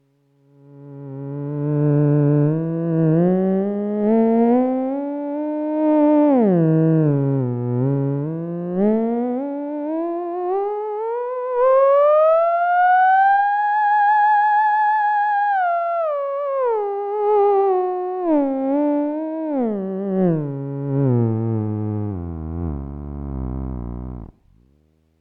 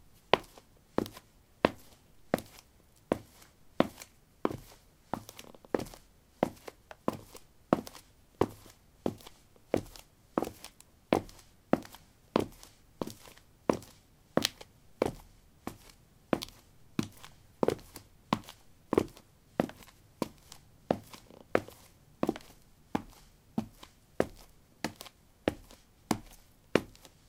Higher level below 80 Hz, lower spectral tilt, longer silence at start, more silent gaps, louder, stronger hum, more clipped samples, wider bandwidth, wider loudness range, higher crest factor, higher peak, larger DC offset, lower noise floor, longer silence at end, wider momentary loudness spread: first, -42 dBFS vs -60 dBFS; first, -11.5 dB/octave vs -5 dB/octave; first, 0.75 s vs 0.35 s; neither; first, -19 LUFS vs -36 LUFS; neither; neither; second, 4.5 kHz vs 18 kHz; first, 7 LU vs 3 LU; second, 12 dB vs 36 dB; second, -6 dBFS vs 0 dBFS; neither; about the same, -60 dBFS vs -62 dBFS; first, 0.95 s vs 0.45 s; second, 13 LU vs 22 LU